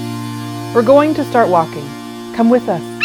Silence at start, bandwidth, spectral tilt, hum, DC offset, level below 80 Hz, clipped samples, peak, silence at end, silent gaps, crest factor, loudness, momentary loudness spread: 0 s; 16.5 kHz; -6.5 dB/octave; none; under 0.1%; -54 dBFS; under 0.1%; 0 dBFS; 0 s; none; 14 dB; -14 LUFS; 15 LU